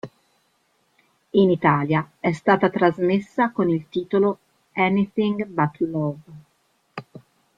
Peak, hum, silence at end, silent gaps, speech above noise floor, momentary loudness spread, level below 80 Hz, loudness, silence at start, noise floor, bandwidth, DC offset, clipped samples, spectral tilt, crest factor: -2 dBFS; none; 0.4 s; none; 46 dB; 19 LU; -62 dBFS; -21 LUFS; 0.05 s; -66 dBFS; 7.6 kHz; under 0.1%; under 0.1%; -8.5 dB/octave; 20 dB